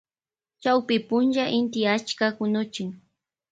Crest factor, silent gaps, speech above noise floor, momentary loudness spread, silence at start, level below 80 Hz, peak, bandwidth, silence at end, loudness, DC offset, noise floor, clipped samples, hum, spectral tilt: 16 dB; none; over 66 dB; 8 LU; 0.6 s; -70 dBFS; -8 dBFS; 9 kHz; 0.55 s; -24 LUFS; under 0.1%; under -90 dBFS; under 0.1%; none; -5 dB/octave